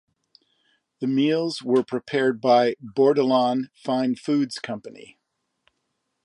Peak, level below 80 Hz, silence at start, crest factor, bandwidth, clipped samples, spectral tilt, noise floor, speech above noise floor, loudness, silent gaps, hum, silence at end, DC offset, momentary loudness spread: -8 dBFS; -76 dBFS; 1 s; 16 dB; 11 kHz; under 0.1%; -6 dB/octave; -76 dBFS; 54 dB; -22 LUFS; none; none; 1.25 s; under 0.1%; 12 LU